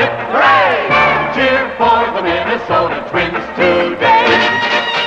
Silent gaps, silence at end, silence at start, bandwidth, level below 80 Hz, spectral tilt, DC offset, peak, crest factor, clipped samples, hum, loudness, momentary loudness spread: none; 0 s; 0 s; 8.6 kHz; -42 dBFS; -5 dB/octave; under 0.1%; 0 dBFS; 12 dB; under 0.1%; none; -12 LUFS; 7 LU